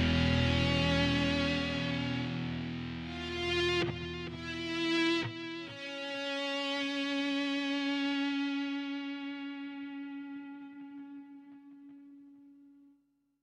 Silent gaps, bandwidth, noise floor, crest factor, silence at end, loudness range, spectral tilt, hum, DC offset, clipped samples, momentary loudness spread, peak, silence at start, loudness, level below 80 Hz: none; 10.5 kHz; -72 dBFS; 16 dB; 0.7 s; 14 LU; -5.5 dB/octave; none; under 0.1%; under 0.1%; 19 LU; -18 dBFS; 0 s; -33 LUFS; -50 dBFS